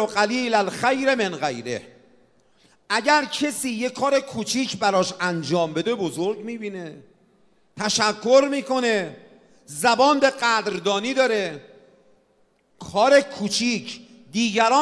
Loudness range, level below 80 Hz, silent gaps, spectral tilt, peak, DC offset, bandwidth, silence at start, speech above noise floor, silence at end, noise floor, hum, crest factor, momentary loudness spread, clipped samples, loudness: 4 LU; -68 dBFS; none; -3.5 dB/octave; -4 dBFS; under 0.1%; 11 kHz; 0 s; 41 dB; 0 s; -63 dBFS; none; 20 dB; 14 LU; under 0.1%; -21 LUFS